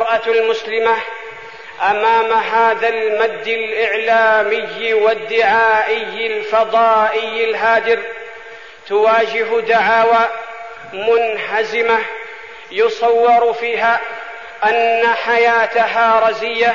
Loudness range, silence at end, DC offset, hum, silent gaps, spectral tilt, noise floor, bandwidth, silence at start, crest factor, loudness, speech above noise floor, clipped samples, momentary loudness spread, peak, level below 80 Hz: 2 LU; 0 s; 0.5%; none; none; -3 dB/octave; -36 dBFS; 7.2 kHz; 0 s; 12 dB; -15 LUFS; 21 dB; under 0.1%; 16 LU; -2 dBFS; -60 dBFS